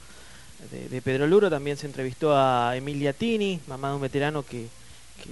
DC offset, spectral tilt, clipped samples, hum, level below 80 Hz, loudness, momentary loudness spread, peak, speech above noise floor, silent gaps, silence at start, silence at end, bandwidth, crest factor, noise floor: 0.4%; -6 dB/octave; under 0.1%; none; -56 dBFS; -25 LUFS; 19 LU; -8 dBFS; 23 dB; none; 0 s; 0 s; 11.5 kHz; 18 dB; -48 dBFS